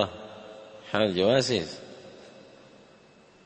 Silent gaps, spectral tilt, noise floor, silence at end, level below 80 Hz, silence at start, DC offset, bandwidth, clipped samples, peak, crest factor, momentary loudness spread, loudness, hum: none; -4.5 dB/octave; -56 dBFS; 1.15 s; -64 dBFS; 0 s; under 0.1%; 8.8 kHz; under 0.1%; -8 dBFS; 22 dB; 25 LU; -26 LUFS; none